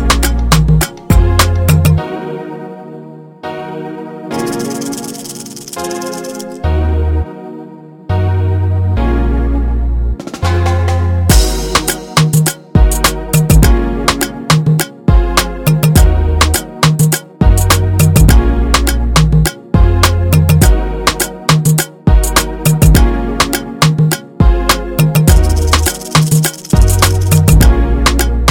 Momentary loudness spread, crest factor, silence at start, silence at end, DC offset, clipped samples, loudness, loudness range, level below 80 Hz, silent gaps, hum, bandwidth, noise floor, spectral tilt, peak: 13 LU; 10 dB; 0 s; 0 s; under 0.1%; 0.2%; -12 LUFS; 9 LU; -14 dBFS; none; none; 18 kHz; -32 dBFS; -5 dB/octave; 0 dBFS